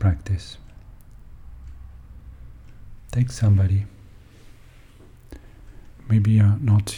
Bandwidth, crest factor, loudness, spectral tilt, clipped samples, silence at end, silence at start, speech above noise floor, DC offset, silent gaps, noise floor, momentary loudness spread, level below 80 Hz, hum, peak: 11 kHz; 16 dB; -21 LUFS; -7 dB/octave; under 0.1%; 0 s; 0 s; 28 dB; under 0.1%; none; -47 dBFS; 27 LU; -42 dBFS; none; -8 dBFS